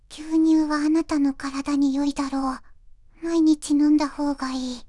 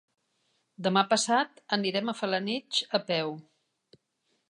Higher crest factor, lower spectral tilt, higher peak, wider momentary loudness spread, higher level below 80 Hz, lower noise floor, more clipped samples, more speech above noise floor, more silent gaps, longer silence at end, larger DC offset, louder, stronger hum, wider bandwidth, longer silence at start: second, 12 dB vs 20 dB; about the same, -4 dB/octave vs -3.5 dB/octave; about the same, -10 dBFS vs -10 dBFS; about the same, 9 LU vs 7 LU; first, -48 dBFS vs -84 dBFS; second, -48 dBFS vs -76 dBFS; neither; second, 26 dB vs 48 dB; neither; second, 0.05 s vs 1.1 s; neither; first, -22 LUFS vs -28 LUFS; neither; about the same, 11.5 kHz vs 11 kHz; second, 0.1 s vs 0.8 s